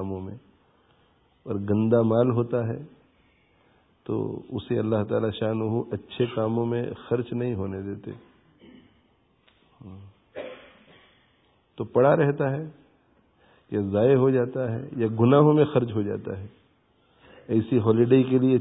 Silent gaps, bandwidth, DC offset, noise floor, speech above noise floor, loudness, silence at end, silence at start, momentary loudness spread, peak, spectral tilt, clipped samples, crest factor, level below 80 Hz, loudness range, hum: none; 4 kHz; under 0.1%; -64 dBFS; 41 dB; -24 LUFS; 0 s; 0 s; 20 LU; -6 dBFS; -12.5 dB/octave; under 0.1%; 20 dB; -56 dBFS; 11 LU; none